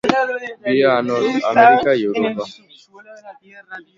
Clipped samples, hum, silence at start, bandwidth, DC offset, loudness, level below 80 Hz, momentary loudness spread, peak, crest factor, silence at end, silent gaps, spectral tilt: under 0.1%; none; 0.05 s; 7.6 kHz; under 0.1%; -16 LUFS; -58 dBFS; 18 LU; 0 dBFS; 18 dB; 0.15 s; none; -5.5 dB/octave